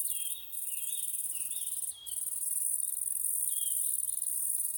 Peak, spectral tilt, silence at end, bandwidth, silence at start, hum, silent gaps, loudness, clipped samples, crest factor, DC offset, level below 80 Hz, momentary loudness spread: -18 dBFS; 3.5 dB/octave; 0 s; 19 kHz; 0 s; none; none; -31 LUFS; under 0.1%; 16 dB; under 0.1%; -78 dBFS; 6 LU